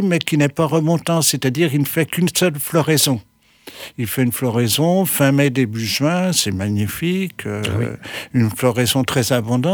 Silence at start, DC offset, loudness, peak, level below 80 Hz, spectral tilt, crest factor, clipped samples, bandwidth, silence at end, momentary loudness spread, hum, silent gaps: 0 s; under 0.1%; -18 LUFS; -2 dBFS; -54 dBFS; -4.5 dB/octave; 16 dB; under 0.1%; over 20 kHz; 0 s; 8 LU; none; none